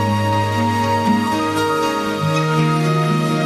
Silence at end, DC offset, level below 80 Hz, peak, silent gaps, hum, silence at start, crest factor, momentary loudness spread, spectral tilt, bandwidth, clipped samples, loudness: 0 s; under 0.1%; -46 dBFS; -6 dBFS; none; none; 0 s; 12 dB; 2 LU; -6 dB/octave; 14 kHz; under 0.1%; -17 LUFS